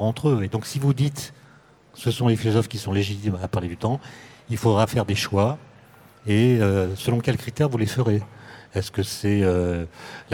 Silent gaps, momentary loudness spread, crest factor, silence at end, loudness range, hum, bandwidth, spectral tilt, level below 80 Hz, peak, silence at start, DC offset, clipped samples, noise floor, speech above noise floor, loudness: none; 14 LU; 16 dB; 0 s; 3 LU; none; 17.5 kHz; -6.5 dB/octave; -50 dBFS; -6 dBFS; 0 s; under 0.1%; under 0.1%; -52 dBFS; 30 dB; -23 LUFS